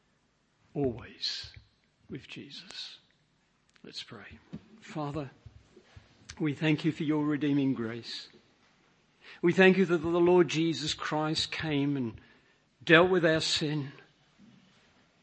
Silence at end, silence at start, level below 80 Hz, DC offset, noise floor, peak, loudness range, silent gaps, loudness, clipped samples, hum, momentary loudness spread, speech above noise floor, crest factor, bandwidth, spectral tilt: 1.3 s; 0.75 s; -64 dBFS; under 0.1%; -71 dBFS; -4 dBFS; 17 LU; none; -28 LUFS; under 0.1%; none; 23 LU; 43 dB; 26 dB; 8.8 kHz; -5.5 dB/octave